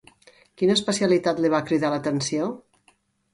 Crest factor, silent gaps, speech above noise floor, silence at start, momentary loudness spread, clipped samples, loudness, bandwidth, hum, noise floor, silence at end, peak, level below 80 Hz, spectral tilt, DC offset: 18 dB; none; 41 dB; 0.6 s; 7 LU; under 0.1%; -23 LUFS; 11.5 kHz; none; -63 dBFS; 0.75 s; -8 dBFS; -64 dBFS; -4.5 dB/octave; under 0.1%